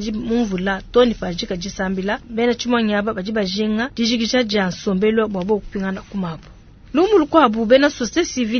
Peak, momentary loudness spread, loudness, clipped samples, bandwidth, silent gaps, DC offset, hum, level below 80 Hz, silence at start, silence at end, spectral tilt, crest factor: 0 dBFS; 11 LU; -19 LUFS; under 0.1%; 6.6 kHz; none; under 0.1%; none; -42 dBFS; 0 s; 0 s; -5 dB/octave; 18 dB